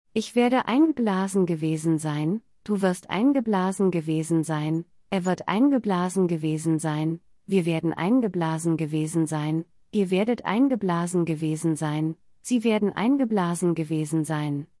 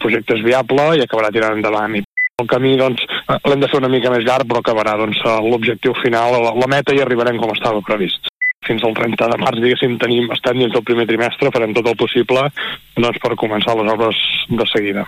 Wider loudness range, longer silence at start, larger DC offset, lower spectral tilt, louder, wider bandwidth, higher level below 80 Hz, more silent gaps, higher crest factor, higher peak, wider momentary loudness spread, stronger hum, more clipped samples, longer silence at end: about the same, 1 LU vs 1 LU; first, 0.15 s vs 0 s; neither; about the same, -6.5 dB/octave vs -5.5 dB/octave; second, -25 LUFS vs -15 LUFS; second, 12 kHz vs 15.5 kHz; second, -68 dBFS vs -52 dBFS; second, none vs 2.04-2.17 s, 2.30-2.34 s, 8.29-8.35 s, 8.54-8.60 s; about the same, 16 dB vs 12 dB; second, -8 dBFS vs -2 dBFS; first, 7 LU vs 4 LU; neither; neither; first, 0.15 s vs 0 s